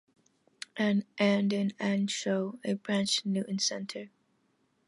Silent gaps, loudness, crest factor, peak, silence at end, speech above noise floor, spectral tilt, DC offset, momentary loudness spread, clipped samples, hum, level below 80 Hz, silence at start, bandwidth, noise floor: none; -30 LUFS; 18 dB; -14 dBFS; 0.8 s; 43 dB; -4.5 dB/octave; under 0.1%; 14 LU; under 0.1%; none; -78 dBFS; 0.75 s; 11.5 kHz; -73 dBFS